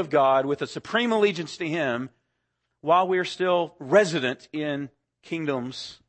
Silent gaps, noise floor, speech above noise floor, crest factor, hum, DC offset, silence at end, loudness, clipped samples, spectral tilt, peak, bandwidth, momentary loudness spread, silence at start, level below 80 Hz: none; -78 dBFS; 53 dB; 20 dB; none; under 0.1%; 0.15 s; -25 LUFS; under 0.1%; -5 dB/octave; -6 dBFS; 8.8 kHz; 13 LU; 0 s; -72 dBFS